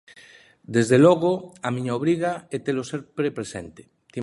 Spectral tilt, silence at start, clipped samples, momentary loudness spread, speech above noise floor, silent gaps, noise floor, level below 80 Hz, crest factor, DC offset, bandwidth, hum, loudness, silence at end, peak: -6.5 dB/octave; 0.7 s; under 0.1%; 18 LU; 29 dB; none; -51 dBFS; -60 dBFS; 18 dB; under 0.1%; 11.5 kHz; none; -23 LUFS; 0 s; -4 dBFS